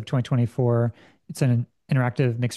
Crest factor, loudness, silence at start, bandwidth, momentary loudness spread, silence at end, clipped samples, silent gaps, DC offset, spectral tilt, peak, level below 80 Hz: 16 dB; -24 LUFS; 0 s; 12.5 kHz; 4 LU; 0 s; under 0.1%; none; under 0.1%; -7.5 dB/octave; -8 dBFS; -62 dBFS